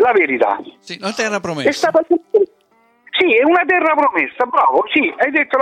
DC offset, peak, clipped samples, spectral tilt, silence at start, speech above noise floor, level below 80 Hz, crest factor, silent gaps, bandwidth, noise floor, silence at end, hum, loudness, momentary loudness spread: under 0.1%; -4 dBFS; under 0.1%; -4 dB/octave; 0 s; 41 dB; -62 dBFS; 12 dB; none; 13 kHz; -56 dBFS; 0 s; none; -15 LUFS; 9 LU